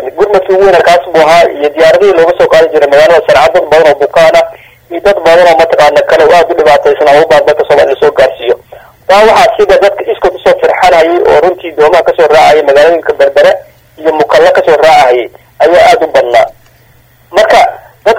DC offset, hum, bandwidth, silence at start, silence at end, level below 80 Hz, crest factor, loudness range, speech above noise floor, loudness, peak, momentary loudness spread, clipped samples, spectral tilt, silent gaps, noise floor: under 0.1%; none; 16.5 kHz; 0 s; 0 s; -38 dBFS; 6 dB; 2 LU; 37 dB; -5 LUFS; 0 dBFS; 7 LU; 8%; -4 dB/octave; none; -42 dBFS